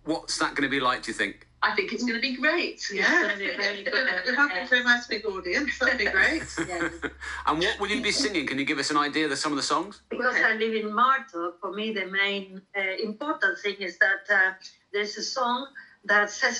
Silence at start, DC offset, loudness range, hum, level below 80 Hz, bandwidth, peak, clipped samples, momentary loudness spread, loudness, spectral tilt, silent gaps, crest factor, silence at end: 0.05 s; under 0.1%; 2 LU; none; -56 dBFS; 11.5 kHz; -8 dBFS; under 0.1%; 9 LU; -25 LUFS; -2.5 dB/octave; none; 18 dB; 0 s